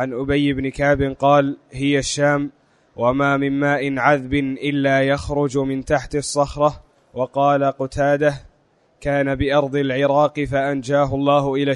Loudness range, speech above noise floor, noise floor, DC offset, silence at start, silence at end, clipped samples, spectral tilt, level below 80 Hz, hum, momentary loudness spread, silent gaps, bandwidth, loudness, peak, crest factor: 2 LU; 41 dB; -59 dBFS; under 0.1%; 0 s; 0 s; under 0.1%; -5.5 dB/octave; -42 dBFS; none; 5 LU; none; 11 kHz; -19 LUFS; -2 dBFS; 18 dB